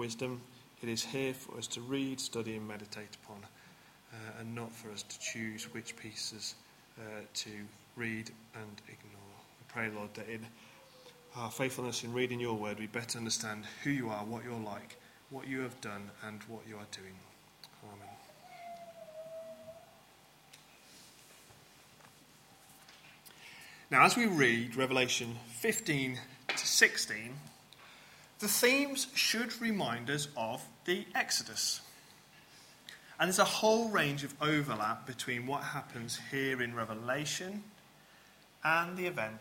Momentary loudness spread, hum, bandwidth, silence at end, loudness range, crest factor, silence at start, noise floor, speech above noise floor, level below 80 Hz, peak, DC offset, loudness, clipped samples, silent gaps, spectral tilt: 25 LU; none; 16.5 kHz; 0 s; 19 LU; 28 dB; 0 s; -62 dBFS; 26 dB; -76 dBFS; -10 dBFS; under 0.1%; -34 LUFS; under 0.1%; none; -3 dB/octave